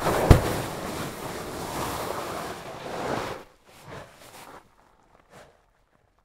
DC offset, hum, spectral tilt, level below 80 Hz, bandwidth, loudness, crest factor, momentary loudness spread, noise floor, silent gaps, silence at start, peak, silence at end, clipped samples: under 0.1%; none; -5.5 dB/octave; -36 dBFS; 16 kHz; -28 LUFS; 28 dB; 26 LU; -65 dBFS; none; 0 s; 0 dBFS; 0.8 s; under 0.1%